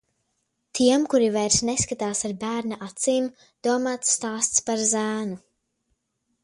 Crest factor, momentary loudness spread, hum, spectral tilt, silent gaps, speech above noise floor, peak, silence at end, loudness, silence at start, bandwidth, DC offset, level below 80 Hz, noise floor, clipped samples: 20 dB; 10 LU; none; -3 dB/octave; none; 51 dB; -6 dBFS; 1.05 s; -23 LUFS; 0.75 s; 11.5 kHz; under 0.1%; -56 dBFS; -75 dBFS; under 0.1%